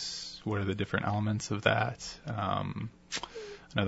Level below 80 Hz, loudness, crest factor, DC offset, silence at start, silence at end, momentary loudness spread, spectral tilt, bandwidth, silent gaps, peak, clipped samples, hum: -60 dBFS; -33 LUFS; 26 dB; under 0.1%; 0 s; 0 s; 11 LU; -5 dB/octave; 8 kHz; none; -8 dBFS; under 0.1%; none